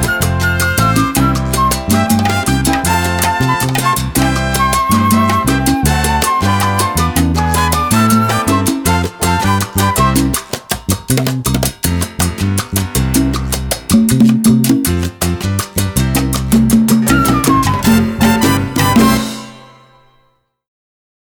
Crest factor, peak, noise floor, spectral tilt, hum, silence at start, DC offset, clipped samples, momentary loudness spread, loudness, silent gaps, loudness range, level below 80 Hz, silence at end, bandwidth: 12 dB; 0 dBFS; -57 dBFS; -4.5 dB/octave; none; 0 s; under 0.1%; under 0.1%; 6 LU; -13 LUFS; none; 3 LU; -26 dBFS; 1.65 s; over 20 kHz